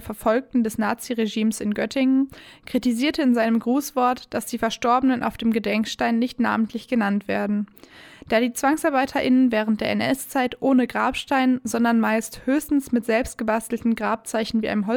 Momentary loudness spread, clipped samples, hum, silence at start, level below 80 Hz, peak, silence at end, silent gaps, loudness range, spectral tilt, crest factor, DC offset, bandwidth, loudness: 5 LU; under 0.1%; none; 0 s; -52 dBFS; -8 dBFS; 0 s; none; 2 LU; -4.5 dB/octave; 14 dB; under 0.1%; 18.5 kHz; -22 LUFS